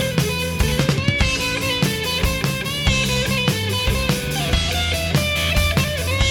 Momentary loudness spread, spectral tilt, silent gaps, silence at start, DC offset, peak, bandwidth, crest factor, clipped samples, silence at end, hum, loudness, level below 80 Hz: 3 LU; -4 dB/octave; none; 0 s; under 0.1%; 0 dBFS; 18 kHz; 18 dB; under 0.1%; 0 s; none; -19 LUFS; -28 dBFS